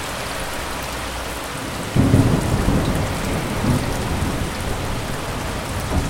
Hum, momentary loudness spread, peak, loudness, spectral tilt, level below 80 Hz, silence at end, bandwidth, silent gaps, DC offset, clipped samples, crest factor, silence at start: none; 10 LU; 0 dBFS; -22 LUFS; -5.5 dB/octave; -30 dBFS; 0 s; 16.5 kHz; none; under 0.1%; under 0.1%; 20 dB; 0 s